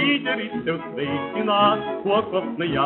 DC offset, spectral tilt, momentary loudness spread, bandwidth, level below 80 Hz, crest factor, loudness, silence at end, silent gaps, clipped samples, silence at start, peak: under 0.1%; -2.5 dB/octave; 8 LU; 4.2 kHz; -56 dBFS; 16 dB; -23 LUFS; 0 s; none; under 0.1%; 0 s; -6 dBFS